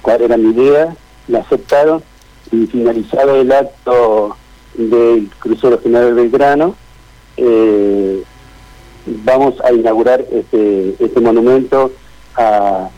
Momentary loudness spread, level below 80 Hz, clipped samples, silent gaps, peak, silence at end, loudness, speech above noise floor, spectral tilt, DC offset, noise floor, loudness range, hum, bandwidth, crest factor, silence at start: 9 LU; -42 dBFS; under 0.1%; none; -4 dBFS; 0.1 s; -12 LUFS; 30 dB; -7 dB/octave; under 0.1%; -41 dBFS; 2 LU; none; 9.6 kHz; 8 dB; 0.05 s